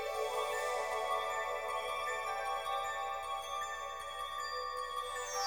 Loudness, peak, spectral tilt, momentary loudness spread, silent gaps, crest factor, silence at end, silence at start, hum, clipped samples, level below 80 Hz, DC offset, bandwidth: -38 LUFS; -24 dBFS; 0 dB/octave; 4 LU; none; 14 dB; 0 s; 0 s; none; under 0.1%; -66 dBFS; under 0.1%; over 20 kHz